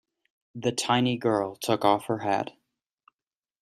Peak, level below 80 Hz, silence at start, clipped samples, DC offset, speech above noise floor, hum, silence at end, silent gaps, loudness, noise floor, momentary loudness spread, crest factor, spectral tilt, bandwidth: -6 dBFS; -68 dBFS; 0.55 s; under 0.1%; under 0.1%; over 64 dB; none; 1.1 s; none; -26 LUFS; under -90 dBFS; 7 LU; 22 dB; -4.5 dB/octave; 14.5 kHz